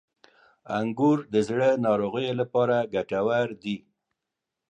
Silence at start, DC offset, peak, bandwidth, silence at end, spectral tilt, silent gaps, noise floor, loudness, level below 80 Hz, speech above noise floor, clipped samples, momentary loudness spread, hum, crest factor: 0.65 s; under 0.1%; -10 dBFS; 9.6 kHz; 0.95 s; -7 dB/octave; none; -86 dBFS; -25 LUFS; -66 dBFS; 61 dB; under 0.1%; 9 LU; none; 16 dB